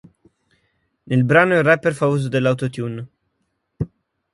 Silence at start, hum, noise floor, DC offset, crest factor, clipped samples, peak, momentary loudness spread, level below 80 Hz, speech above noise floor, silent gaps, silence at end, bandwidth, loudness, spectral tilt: 1.05 s; none; -72 dBFS; under 0.1%; 20 dB; under 0.1%; 0 dBFS; 16 LU; -52 dBFS; 55 dB; none; 0.5 s; 11.5 kHz; -18 LUFS; -7 dB/octave